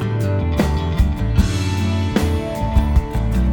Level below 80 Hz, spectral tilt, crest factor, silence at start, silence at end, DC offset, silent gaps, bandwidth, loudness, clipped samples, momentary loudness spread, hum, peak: -20 dBFS; -7 dB/octave; 14 dB; 0 s; 0 s; under 0.1%; none; 19 kHz; -19 LUFS; under 0.1%; 2 LU; none; -2 dBFS